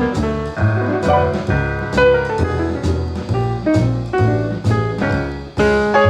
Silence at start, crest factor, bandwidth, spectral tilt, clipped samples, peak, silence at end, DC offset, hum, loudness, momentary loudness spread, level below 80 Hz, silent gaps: 0 s; 16 dB; 9.8 kHz; -7.5 dB/octave; under 0.1%; 0 dBFS; 0 s; under 0.1%; none; -17 LUFS; 6 LU; -30 dBFS; none